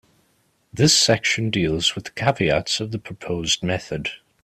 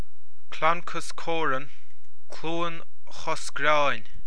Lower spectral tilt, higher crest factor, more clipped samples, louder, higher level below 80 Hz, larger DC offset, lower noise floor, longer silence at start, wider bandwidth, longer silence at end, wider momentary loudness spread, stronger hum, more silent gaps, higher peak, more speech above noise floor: about the same, -3.5 dB/octave vs -3.5 dB/octave; about the same, 20 dB vs 22 dB; neither; first, -20 LUFS vs -28 LUFS; first, -48 dBFS vs -58 dBFS; second, under 0.1% vs 10%; about the same, -64 dBFS vs -63 dBFS; first, 0.75 s vs 0.5 s; first, 15.5 kHz vs 11 kHz; first, 0.25 s vs 0 s; second, 14 LU vs 20 LU; neither; neither; first, -4 dBFS vs -8 dBFS; first, 43 dB vs 35 dB